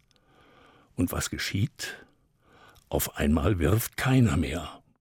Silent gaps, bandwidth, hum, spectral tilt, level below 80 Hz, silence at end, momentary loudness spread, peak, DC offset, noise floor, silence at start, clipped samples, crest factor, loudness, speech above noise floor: none; 18 kHz; none; -5.5 dB/octave; -42 dBFS; 0.25 s; 14 LU; -10 dBFS; under 0.1%; -62 dBFS; 1 s; under 0.1%; 18 dB; -27 LUFS; 36 dB